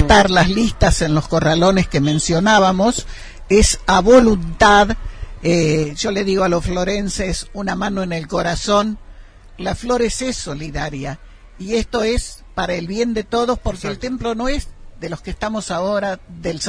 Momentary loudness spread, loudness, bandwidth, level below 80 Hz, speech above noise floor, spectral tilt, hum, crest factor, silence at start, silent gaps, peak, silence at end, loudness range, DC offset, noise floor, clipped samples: 15 LU; -17 LUFS; 10.5 kHz; -28 dBFS; 22 dB; -4.5 dB/octave; none; 16 dB; 0 s; none; 0 dBFS; 0 s; 8 LU; under 0.1%; -39 dBFS; under 0.1%